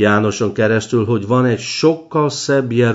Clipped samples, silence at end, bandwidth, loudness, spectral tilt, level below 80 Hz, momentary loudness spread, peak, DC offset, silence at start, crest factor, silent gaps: under 0.1%; 0 s; 8 kHz; -16 LUFS; -5.5 dB/octave; -56 dBFS; 3 LU; 0 dBFS; under 0.1%; 0 s; 14 dB; none